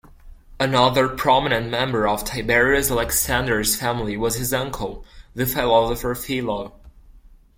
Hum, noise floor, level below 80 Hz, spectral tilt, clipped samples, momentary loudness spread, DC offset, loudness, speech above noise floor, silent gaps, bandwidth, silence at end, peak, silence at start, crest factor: none; -48 dBFS; -38 dBFS; -3.5 dB/octave; under 0.1%; 10 LU; under 0.1%; -20 LUFS; 27 dB; none; 16.5 kHz; 0.4 s; -2 dBFS; 0.25 s; 20 dB